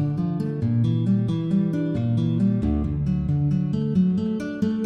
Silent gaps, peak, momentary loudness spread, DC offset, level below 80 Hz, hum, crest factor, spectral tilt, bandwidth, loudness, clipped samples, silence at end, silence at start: none; -10 dBFS; 4 LU; under 0.1%; -40 dBFS; none; 12 dB; -10 dB/octave; 6.6 kHz; -23 LUFS; under 0.1%; 0 s; 0 s